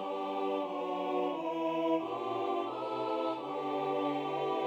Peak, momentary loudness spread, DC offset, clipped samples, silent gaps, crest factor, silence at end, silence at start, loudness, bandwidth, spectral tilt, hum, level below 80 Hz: -20 dBFS; 3 LU; under 0.1%; under 0.1%; none; 14 dB; 0 s; 0 s; -34 LUFS; 17.5 kHz; -6.5 dB/octave; none; -86 dBFS